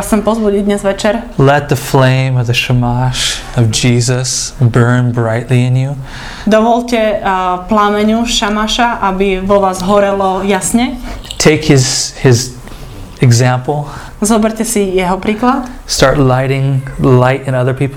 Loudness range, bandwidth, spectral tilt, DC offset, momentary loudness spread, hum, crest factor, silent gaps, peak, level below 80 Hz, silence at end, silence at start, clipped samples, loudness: 1 LU; 16 kHz; -5 dB/octave; under 0.1%; 7 LU; none; 12 dB; none; 0 dBFS; -30 dBFS; 0 s; 0 s; 0.3%; -11 LUFS